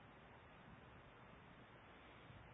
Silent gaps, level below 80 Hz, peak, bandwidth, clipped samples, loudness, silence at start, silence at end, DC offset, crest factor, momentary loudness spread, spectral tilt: none; -74 dBFS; -50 dBFS; 3.8 kHz; under 0.1%; -62 LUFS; 0 s; 0 s; under 0.1%; 12 dB; 1 LU; -3 dB/octave